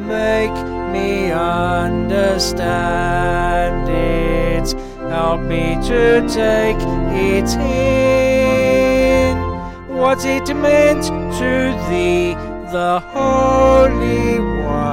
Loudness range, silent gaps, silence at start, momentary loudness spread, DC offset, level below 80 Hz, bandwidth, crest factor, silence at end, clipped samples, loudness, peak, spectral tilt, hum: 3 LU; none; 0 s; 8 LU; 0.2%; -26 dBFS; 16.5 kHz; 14 dB; 0 s; under 0.1%; -16 LUFS; -2 dBFS; -5.5 dB/octave; none